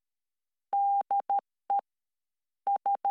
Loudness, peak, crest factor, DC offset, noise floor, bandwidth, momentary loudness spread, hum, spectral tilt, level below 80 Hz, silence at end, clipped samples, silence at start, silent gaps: -31 LUFS; -22 dBFS; 10 dB; under 0.1%; under -90 dBFS; 3.3 kHz; 5 LU; none; -4.5 dB/octave; under -90 dBFS; 0 s; under 0.1%; 0.7 s; none